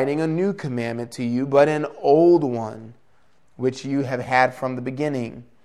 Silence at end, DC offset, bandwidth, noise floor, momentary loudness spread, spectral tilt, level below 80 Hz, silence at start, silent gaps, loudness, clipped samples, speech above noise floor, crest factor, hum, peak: 0.2 s; 0.2%; 11.5 kHz; -63 dBFS; 12 LU; -7 dB/octave; -64 dBFS; 0 s; none; -21 LUFS; under 0.1%; 42 dB; 18 dB; none; -2 dBFS